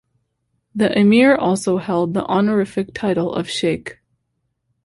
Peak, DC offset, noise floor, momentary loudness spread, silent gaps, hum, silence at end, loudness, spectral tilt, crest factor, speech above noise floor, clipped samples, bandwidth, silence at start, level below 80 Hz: -2 dBFS; under 0.1%; -72 dBFS; 10 LU; none; none; 0.95 s; -18 LUFS; -6 dB/octave; 16 dB; 55 dB; under 0.1%; 11.5 kHz; 0.75 s; -54 dBFS